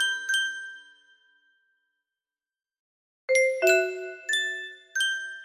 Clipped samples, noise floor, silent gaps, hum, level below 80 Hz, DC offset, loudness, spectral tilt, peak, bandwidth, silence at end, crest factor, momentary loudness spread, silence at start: under 0.1%; under -90 dBFS; 2.79-3.28 s; none; -80 dBFS; under 0.1%; -25 LUFS; 1 dB/octave; -8 dBFS; 15.5 kHz; 0 s; 20 dB; 17 LU; 0 s